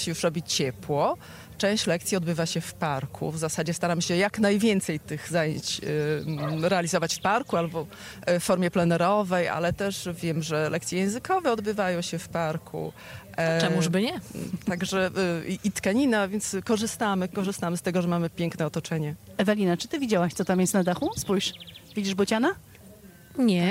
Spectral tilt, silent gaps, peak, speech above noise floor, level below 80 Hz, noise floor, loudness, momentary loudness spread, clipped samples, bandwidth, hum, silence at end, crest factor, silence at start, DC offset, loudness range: -5 dB/octave; none; -10 dBFS; 23 dB; -58 dBFS; -49 dBFS; -27 LUFS; 8 LU; under 0.1%; 16 kHz; none; 0 s; 16 dB; 0 s; under 0.1%; 2 LU